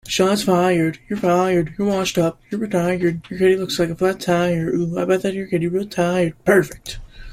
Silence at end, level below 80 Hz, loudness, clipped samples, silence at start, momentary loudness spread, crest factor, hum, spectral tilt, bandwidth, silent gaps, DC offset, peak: 0 s; -46 dBFS; -19 LUFS; under 0.1%; 0.05 s; 6 LU; 18 dB; none; -5.5 dB/octave; 15.5 kHz; none; under 0.1%; -2 dBFS